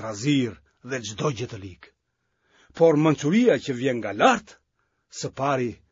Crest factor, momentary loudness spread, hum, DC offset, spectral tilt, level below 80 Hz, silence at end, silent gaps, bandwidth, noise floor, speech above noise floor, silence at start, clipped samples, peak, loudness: 20 dB; 15 LU; none; under 0.1%; -5.5 dB/octave; -62 dBFS; 0.15 s; none; 7.8 kHz; -75 dBFS; 52 dB; 0 s; under 0.1%; -4 dBFS; -23 LUFS